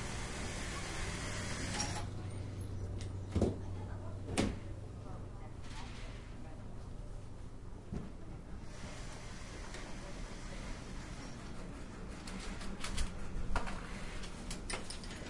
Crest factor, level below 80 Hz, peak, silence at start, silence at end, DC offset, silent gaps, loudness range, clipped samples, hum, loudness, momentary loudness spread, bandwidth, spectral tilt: 22 dB; -46 dBFS; -20 dBFS; 0 s; 0 s; under 0.1%; none; 9 LU; under 0.1%; none; -44 LUFS; 12 LU; 11.5 kHz; -4.5 dB/octave